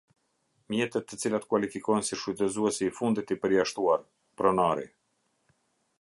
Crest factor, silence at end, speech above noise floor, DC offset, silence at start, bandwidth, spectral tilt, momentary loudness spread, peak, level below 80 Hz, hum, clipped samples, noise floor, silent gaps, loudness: 20 dB; 1.15 s; 47 dB; under 0.1%; 0.7 s; 11.5 kHz; -4.5 dB/octave; 6 LU; -10 dBFS; -66 dBFS; none; under 0.1%; -75 dBFS; none; -29 LUFS